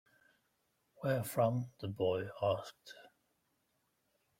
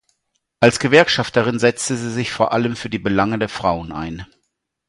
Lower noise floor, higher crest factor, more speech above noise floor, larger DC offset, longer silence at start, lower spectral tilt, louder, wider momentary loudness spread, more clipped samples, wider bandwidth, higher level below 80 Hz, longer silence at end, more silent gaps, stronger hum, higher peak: first, -80 dBFS vs -73 dBFS; about the same, 22 dB vs 18 dB; second, 44 dB vs 55 dB; neither; first, 1 s vs 0.6 s; first, -6.5 dB/octave vs -4.5 dB/octave; second, -37 LUFS vs -18 LUFS; first, 21 LU vs 12 LU; neither; first, 16.5 kHz vs 11.5 kHz; second, -74 dBFS vs -46 dBFS; first, 1.3 s vs 0.65 s; neither; neither; second, -18 dBFS vs 0 dBFS